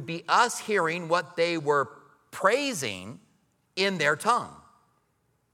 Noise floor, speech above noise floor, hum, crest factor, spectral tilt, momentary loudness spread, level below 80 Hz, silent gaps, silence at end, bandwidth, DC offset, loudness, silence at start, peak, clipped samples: -71 dBFS; 45 dB; none; 20 dB; -3.5 dB/octave; 15 LU; -76 dBFS; none; 0.95 s; 17 kHz; under 0.1%; -26 LUFS; 0 s; -8 dBFS; under 0.1%